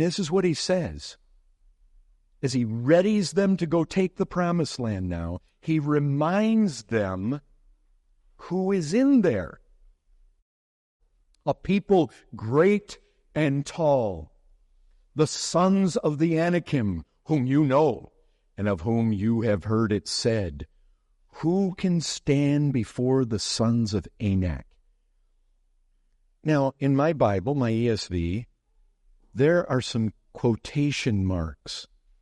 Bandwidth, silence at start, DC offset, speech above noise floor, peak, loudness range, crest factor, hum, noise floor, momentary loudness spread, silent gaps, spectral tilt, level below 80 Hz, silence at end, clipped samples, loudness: 11.5 kHz; 0 s; under 0.1%; 41 dB; -8 dBFS; 3 LU; 18 dB; none; -65 dBFS; 12 LU; 10.42-11.00 s; -6.5 dB/octave; -52 dBFS; 0.4 s; under 0.1%; -25 LUFS